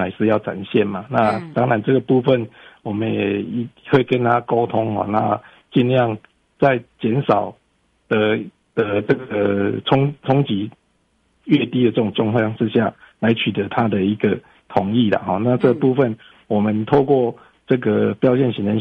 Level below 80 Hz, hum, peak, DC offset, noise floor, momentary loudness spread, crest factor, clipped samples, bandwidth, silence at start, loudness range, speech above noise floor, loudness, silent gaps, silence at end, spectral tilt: -56 dBFS; none; -2 dBFS; under 0.1%; -63 dBFS; 7 LU; 16 dB; under 0.1%; 5.4 kHz; 0 s; 2 LU; 45 dB; -19 LUFS; none; 0 s; -9 dB/octave